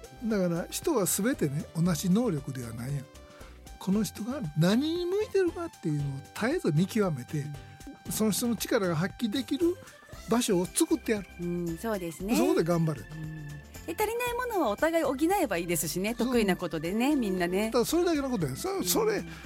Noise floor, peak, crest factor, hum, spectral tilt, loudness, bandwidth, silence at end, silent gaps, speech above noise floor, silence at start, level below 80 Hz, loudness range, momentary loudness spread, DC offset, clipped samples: -48 dBFS; -12 dBFS; 16 dB; none; -5 dB/octave; -29 LUFS; 16.5 kHz; 0 s; none; 20 dB; 0 s; -52 dBFS; 3 LU; 12 LU; under 0.1%; under 0.1%